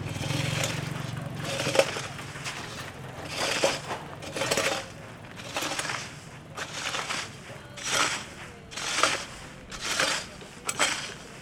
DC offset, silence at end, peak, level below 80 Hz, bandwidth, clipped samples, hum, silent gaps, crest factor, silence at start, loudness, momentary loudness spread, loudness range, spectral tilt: under 0.1%; 0 s; -4 dBFS; -58 dBFS; 17 kHz; under 0.1%; none; none; 28 dB; 0 s; -29 LUFS; 15 LU; 3 LU; -2.5 dB/octave